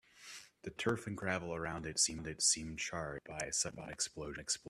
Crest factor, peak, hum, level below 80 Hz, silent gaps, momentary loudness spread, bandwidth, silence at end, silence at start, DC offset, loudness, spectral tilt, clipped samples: 24 dB; -16 dBFS; none; -62 dBFS; none; 16 LU; 14.5 kHz; 0 s; 0.15 s; under 0.1%; -37 LUFS; -2 dB/octave; under 0.1%